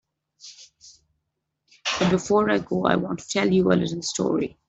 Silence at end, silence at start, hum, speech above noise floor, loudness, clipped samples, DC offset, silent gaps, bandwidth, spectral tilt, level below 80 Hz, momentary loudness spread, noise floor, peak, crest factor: 0.2 s; 0.45 s; none; 57 dB; -23 LUFS; under 0.1%; under 0.1%; none; 8.2 kHz; -5 dB/octave; -56 dBFS; 8 LU; -79 dBFS; -4 dBFS; 22 dB